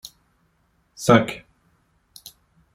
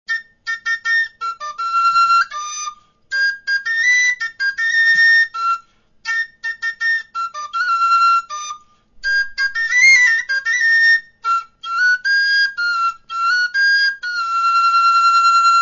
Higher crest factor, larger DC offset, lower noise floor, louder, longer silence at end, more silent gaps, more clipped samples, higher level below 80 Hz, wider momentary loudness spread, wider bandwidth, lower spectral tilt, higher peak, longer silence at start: first, 24 dB vs 14 dB; neither; first, -66 dBFS vs -43 dBFS; second, -19 LUFS vs -15 LUFS; first, 1.35 s vs 0 s; neither; neither; about the same, -56 dBFS vs -58 dBFS; first, 26 LU vs 13 LU; first, 16.5 kHz vs 7.4 kHz; first, -5.5 dB/octave vs 3.5 dB/octave; about the same, -2 dBFS vs -2 dBFS; first, 1 s vs 0.1 s